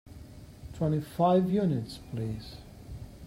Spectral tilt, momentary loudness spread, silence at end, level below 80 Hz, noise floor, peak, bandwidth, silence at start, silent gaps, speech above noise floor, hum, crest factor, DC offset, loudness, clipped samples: -8.5 dB/octave; 23 LU; 0 s; -52 dBFS; -48 dBFS; -12 dBFS; 15.5 kHz; 0.05 s; none; 20 dB; none; 18 dB; under 0.1%; -29 LUFS; under 0.1%